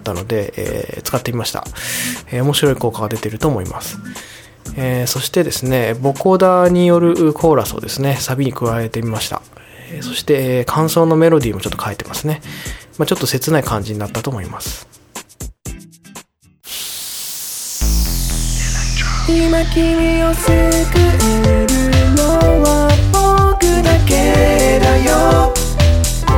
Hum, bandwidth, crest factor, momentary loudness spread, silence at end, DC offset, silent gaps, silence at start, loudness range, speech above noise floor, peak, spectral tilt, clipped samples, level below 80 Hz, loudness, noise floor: none; over 20 kHz; 14 dB; 15 LU; 0 s; under 0.1%; none; 0 s; 10 LU; 29 dB; 0 dBFS; -5 dB/octave; under 0.1%; -22 dBFS; -15 LUFS; -43 dBFS